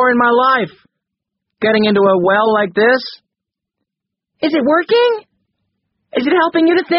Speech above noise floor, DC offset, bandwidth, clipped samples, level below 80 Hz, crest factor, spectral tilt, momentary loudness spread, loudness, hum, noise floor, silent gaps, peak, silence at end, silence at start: 69 dB; under 0.1%; 5.8 kHz; under 0.1%; -60 dBFS; 14 dB; -3 dB/octave; 9 LU; -13 LUFS; none; -82 dBFS; none; 0 dBFS; 0 s; 0 s